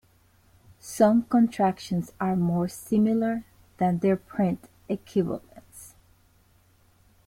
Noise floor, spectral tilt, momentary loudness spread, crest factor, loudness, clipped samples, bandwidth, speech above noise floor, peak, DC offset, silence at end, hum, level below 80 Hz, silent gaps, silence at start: -61 dBFS; -7.5 dB/octave; 16 LU; 20 dB; -26 LUFS; under 0.1%; 16 kHz; 37 dB; -8 dBFS; under 0.1%; 1.4 s; none; -60 dBFS; none; 0.85 s